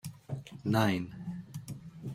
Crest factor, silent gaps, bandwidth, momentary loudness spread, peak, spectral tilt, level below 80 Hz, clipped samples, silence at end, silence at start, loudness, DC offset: 22 dB; none; 16.5 kHz; 15 LU; -12 dBFS; -6.5 dB/octave; -64 dBFS; under 0.1%; 0 s; 0.05 s; -35 LUFS; under 0.1%